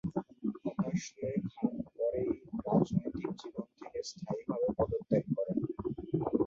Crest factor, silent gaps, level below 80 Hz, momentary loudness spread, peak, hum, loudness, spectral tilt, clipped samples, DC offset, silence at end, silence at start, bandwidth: 20 dB; none; -58 dBFS; 10 LU; -14 dBFS; none; -36 LUFS; -7.5 dB/octave; under 0.1%; under 0.1%; 0 s; 0.05 s; 7.8 kHz